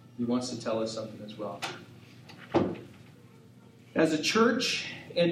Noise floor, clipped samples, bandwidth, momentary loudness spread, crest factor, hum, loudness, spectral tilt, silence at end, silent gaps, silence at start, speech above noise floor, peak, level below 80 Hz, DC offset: -54 dBFS; under 0.1%; 15 kHz; 24 LU; 20 dB; none; -30 LUFS; -4.5 dB/octave; 0 s; none; 0.05 s; 25 dB; -12 dBFS; -70 dBFS; under 0.1%